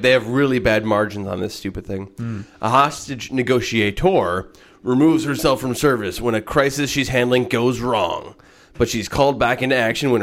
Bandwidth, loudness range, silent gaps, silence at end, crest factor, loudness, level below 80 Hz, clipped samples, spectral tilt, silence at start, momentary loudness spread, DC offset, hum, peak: 16.5 kHz; 2 LU; none; 0 s; 16 dB; -19 LUFS; -42 dBFS; under 0.1%; -5 dB/octave; 0 s; 11 LU; under 0.1%; none; -2 dBFS